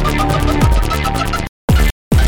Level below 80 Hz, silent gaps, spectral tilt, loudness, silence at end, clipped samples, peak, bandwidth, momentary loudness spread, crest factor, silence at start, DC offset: -16 dBFS; 1.49-1.68 s, 1.92-2.11 s; -5.5 dB/octave; -16 LUFS; 0 s; under 0.1%; -2 dBFS; 18.5 kHz; 5 LU; 12 dB; 0 s; under 0.1%